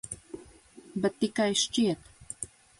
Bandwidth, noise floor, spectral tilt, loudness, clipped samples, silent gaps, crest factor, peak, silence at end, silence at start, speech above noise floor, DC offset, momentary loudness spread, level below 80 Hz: 11.5 kHz; -53 dBFS; -3.5 dB/octave; -29 LUFS; under 0.1%; none; 18 dB; -14 dBFS; 0.35 s; 0.05 s; 25 dB; under 0.1%; 18 LU; -62 dBFS